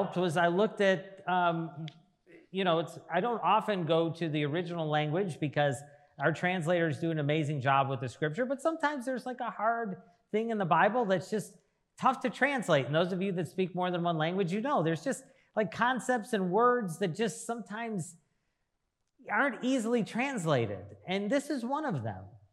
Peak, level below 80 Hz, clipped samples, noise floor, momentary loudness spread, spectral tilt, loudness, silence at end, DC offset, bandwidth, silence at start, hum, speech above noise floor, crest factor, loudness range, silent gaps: -12 dBFS; -82 dBFS; under 0.1%; -81 dBFS; 10 LU; -6 dB/octave; -31 LUFS; 0.15 s; under 0.1%; 13 kHz; 0 s; none; 51 dB; 20 dB; 3 LU; none